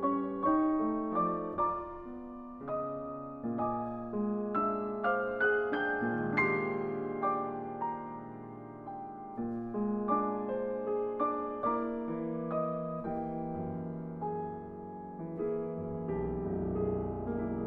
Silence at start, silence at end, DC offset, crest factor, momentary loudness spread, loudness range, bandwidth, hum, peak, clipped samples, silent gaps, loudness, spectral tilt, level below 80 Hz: 0 s; 0 s; under 0.1%; 18 dB; 13 LU; 6 LU; 4.8 kHz; none; -16 dBFS; under 0.1%; none; -34 LUFS; -10 dB/octave; -58 dBFS